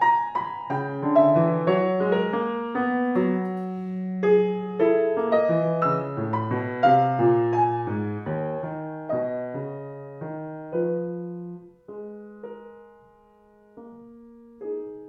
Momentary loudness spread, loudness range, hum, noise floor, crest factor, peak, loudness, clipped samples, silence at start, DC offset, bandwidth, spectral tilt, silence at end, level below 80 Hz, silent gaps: 19 LU; 13 LU; none; -56 dBFS; 18 dB; -6 dBFS; -24 LUFS; under 0.1%; 0 s; under 0.1%; 6.4 kHz; -9.5 dB/octave; 0 s; -68 dBFS; none